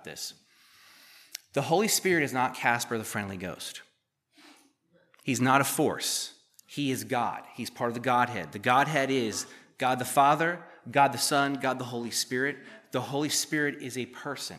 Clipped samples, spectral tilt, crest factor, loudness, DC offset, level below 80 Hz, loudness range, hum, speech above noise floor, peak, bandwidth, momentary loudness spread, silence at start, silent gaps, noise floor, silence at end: under 0.1%; -3.5 dB/octave; 22 dB; -28 LUFS; under 0.1%; -76 dBFS; 4 LU; none; 43 dB; -6 dBFS; 15 kHz; 15 LU; 0.05 s; none; -71 dBFS; 0 s